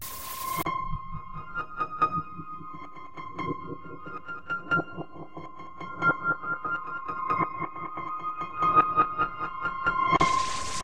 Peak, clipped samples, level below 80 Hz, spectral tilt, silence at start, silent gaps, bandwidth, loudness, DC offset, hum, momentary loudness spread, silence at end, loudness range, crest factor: -8 dBFS; under 0.1%; -50 dBFS; -4 dB/octave; 0 s; none; 16 kHz; -29 LUFS; 0.6%; none; 18 LU; 0 s; 8 LU; 22 dB